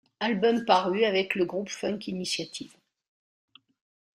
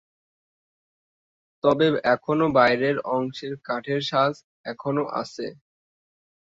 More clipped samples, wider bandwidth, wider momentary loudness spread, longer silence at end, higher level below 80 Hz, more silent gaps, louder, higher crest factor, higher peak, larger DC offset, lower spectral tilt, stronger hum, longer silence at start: neither; first, 14.5 kHz vs 7.8 kHz; second, 12 LU vs 15 LU; first, 1.5 s vs 0.95 s; second, -72 dBFS vs -64 dBFS; second, none vs 4.44-4.64 s; second, -27 LUFS vs -23 LUFS; about the same, 22 dB vs 22 dB; about the same, -6 dBFS vs -4 dBFS; neither; second, -4 dB/octave vs -6.5 dB/octave; neither; second, 0.2 s vs 1.65 s